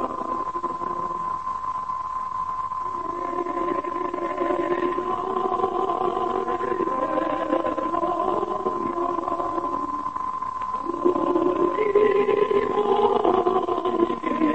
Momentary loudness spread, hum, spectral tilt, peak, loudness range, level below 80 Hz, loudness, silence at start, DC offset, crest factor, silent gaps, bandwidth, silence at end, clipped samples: 8 LU; none; -6.5 dB/octave; -6 dBFS; 6 LU; -54 dBFS; -24 LUFS; 0 s; 0.5%; 18 dB; none; 8.6 kHz; 0 s; under 0.1%